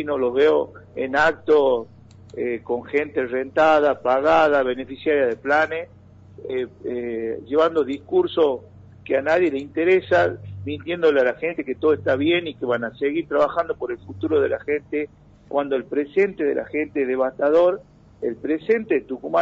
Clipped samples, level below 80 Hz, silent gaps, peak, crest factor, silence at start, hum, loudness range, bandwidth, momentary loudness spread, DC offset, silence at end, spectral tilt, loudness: under 0.1%; -58 dBFS; none; -8 dBFS; 14 dB; 0 s; none; 4 LU; 7.6 kHz; 11 LU; under 0.1%; 0 s; -3.5 dB/octave; -21 LUFS